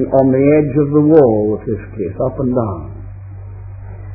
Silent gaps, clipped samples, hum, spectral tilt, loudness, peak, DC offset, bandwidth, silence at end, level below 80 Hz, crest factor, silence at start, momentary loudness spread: none; under 0.1%; none; -14 dB/octave; -14 LUFS; 0 dBFS; under 0.1%; 2.8 kHz; 0 s; -36 dBFS; 14 dB; 0 s; 22 LU